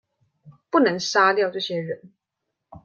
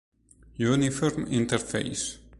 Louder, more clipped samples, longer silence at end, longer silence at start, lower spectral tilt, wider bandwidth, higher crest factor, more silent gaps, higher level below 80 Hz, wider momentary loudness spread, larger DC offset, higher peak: first, -21 LUFS vs -27 LUFS; neither; about the same, 0.05 s vs 0.05 s; about the same, 0.45 s vs 0.55 s; about the same, -4 dB/octave vs -5 dB/octave; second, 7.6 kHz vs 11.5 kHz; about the same, 20 dB vs 18 dB; neither; second, -68 dBFS vs -52 dBFS; first, 13 LU vs 7 LU; neither; first, -4 dBFS vs -10 dBFS